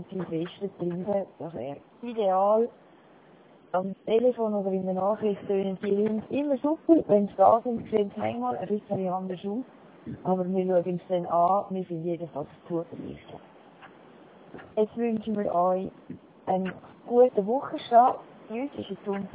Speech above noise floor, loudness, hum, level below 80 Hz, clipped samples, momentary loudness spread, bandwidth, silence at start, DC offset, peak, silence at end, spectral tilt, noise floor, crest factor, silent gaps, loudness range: 28 dB; -27 LUFS; none; -66 dBFS; under 0.1%; 17 LU; 4 kHz; 0 s; under 0.1%; -8 dBFS; 0.05 s; -11 dB/octave; -55 dBFS; 20 dB; none; 6 LU